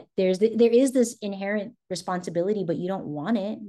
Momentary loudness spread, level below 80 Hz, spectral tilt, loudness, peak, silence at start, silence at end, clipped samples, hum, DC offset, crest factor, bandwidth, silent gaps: 11 LU; -72 dBFS; -5.5 dB/octave; -25 LUFS; -8 dBFS; 0 s; 0 s; under 0.1%; none; under 0.1%; 16 dB; 12.5 kHz; none